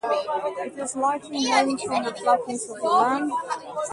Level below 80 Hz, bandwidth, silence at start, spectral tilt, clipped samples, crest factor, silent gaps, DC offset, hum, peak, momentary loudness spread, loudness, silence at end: -70 dBFS; 11.5 kHz; 0.05 s; -2.5 dB/octave; under 0.1%; 18 dB; none; under 0.1%; none; -6 dBFS; 9 LU; -24 LUFS; 0 s